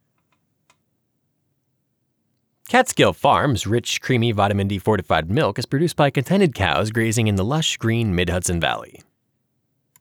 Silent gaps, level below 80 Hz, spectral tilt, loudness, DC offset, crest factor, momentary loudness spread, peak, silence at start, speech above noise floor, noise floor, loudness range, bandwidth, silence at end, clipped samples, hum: none; -46 dBFS; -5 dB/octave; -20 LUFS; under 0.1%; 18 dB; 4 LU; -4 dBFS; 2.7 s; 52 dB; -71 dBFS; 3 LU; 19 kHz; 1.15 s; under 0.1%; none